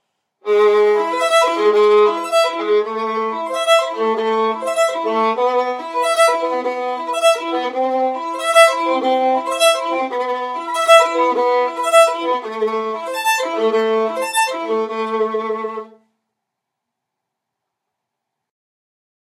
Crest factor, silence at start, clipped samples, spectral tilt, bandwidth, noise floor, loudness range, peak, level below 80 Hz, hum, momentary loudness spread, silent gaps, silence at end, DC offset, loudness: 18 dB; 0.45 s; under 0.1%; -1.5 dB/octave; 16 kHz; -80 dBFS; 7 LU; 0 dBFS; -88 dBFS; none; 9 LU; none; 3.5 s; under 0.1%; -16 LUFS